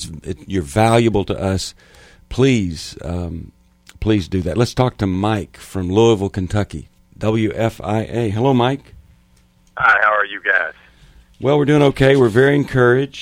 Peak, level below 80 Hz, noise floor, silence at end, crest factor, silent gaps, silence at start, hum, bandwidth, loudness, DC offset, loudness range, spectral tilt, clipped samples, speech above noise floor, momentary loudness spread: 0 dBFS; -40 dBFS; -53 dBFS; 0 s; 18 dB; none; 0 s; none; 16 kHz; -17 LUFS; under 0.1%; 6 LU; -6.5 dB/octave; under 0.1%; 37 dB; 15 LU